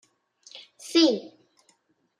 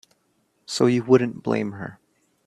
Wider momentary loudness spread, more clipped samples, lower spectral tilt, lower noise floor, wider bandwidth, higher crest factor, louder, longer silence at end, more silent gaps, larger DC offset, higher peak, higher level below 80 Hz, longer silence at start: first, 25 LU vs 16 LU; neither; second, -3 dB/octave vs -6 dB/octave; about the same, -67 dBFS vs -68 dBFS; about the same, 12.5 kHz vs 12 kHz; about the same, 20 dB vs 22 dB; about the same, -23 LUFS vs -22 LUFS; first, 1 s vs 0.55 s; neither; neither; second, -8 dBFS vs -2 dBFS; second, -84 dBFS vs -64 dBFS; second, 0.55 s vs 0.7 s